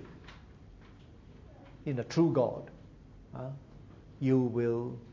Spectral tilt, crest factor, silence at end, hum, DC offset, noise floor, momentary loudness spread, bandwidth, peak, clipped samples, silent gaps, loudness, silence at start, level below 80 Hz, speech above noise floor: -8.5 dB/octave; 18 dB; 0 s; none; under 0.1%; -54 dBFS; 26 LU; 7.4 kHz; -16 dBFS; under 0.1%; none; -32 LUFS; 0 s; -58 dBFS; 23 dB